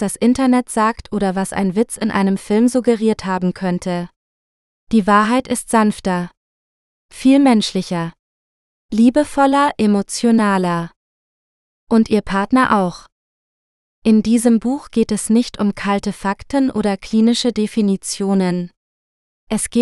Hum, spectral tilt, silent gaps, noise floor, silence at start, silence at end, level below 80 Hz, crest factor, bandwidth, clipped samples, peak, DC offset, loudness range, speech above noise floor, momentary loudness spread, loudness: none; -5.5 dB/octave; 4.16-4.87 s, 6.37-7.09 s, 8.19-8.89 s, 10.96-11.87 s, 13.12-14.02 s, 18.77-19.47 s; under -90 dBFS; 0 s; 0 s; -46 dBFS; 16 dB; 12.5 kHz; under 0.1%; 0 dBFS; under 0.1%; 2 LU; over 74 dB; 8 LU; -17 LUFS